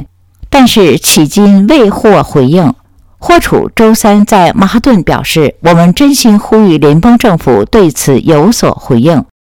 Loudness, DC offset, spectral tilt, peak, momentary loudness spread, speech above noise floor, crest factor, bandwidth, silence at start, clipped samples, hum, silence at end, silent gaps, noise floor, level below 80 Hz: -6 LUFS; 0.7%; -5.5 dB/octave; 0 dBFS; 4 LU; 26 dB; 6 dB; over 20 kHz; 0 s; 6%; none; 0.25 s; none; -31 dBFS; -30 dBFS